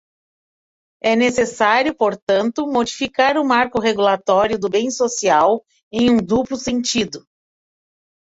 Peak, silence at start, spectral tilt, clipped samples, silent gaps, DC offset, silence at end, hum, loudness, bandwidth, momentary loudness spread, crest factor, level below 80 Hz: -2 dBFS; 1.05 s; -3.5 dB/octave; under 0.1%; 2.22-2.27 s, 5.83-5.91 s; under 0.1%; 1.1 s; none; -18 LUFS; 8 kHz; 6 LU; 16 dB; -52 dBFS